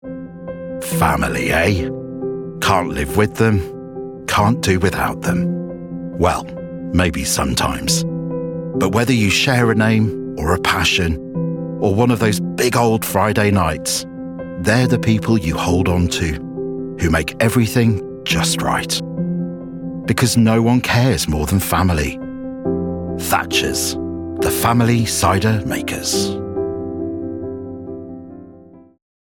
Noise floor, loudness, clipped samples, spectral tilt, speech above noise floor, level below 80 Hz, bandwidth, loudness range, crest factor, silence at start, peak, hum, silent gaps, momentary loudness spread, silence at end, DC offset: -42 dBFS; -18 LUFS; under 0.1%; -5 dB/octave; 26 dB; -38 dBFS; 19.5 kHz; 3 LU; 16 dB; 0.05 s; -2 dBFS; none; none; 13 LU; 0.4 s; under 0.1%